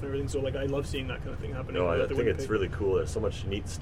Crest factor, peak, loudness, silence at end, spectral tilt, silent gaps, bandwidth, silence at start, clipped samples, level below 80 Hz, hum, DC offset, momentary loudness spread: 14 dB; -16 dBFS; -31 LUFS; 0 s; -6 dB/octave; none; 14.5 kHz; 0 s; under 0.1%; -40 dBFS; none; under 0.1%; 8 LU